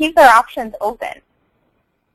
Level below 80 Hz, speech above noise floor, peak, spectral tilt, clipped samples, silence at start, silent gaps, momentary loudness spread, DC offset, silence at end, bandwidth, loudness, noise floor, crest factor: -48 dBFS; 51 dB; 0 dBFS; -2.5 dB/octave; under 0.1%; 0 s; none; 20 LU; under 0.1%; 1 s; 16 kHz; -13 LUFS; -65 dBFS; 16 dB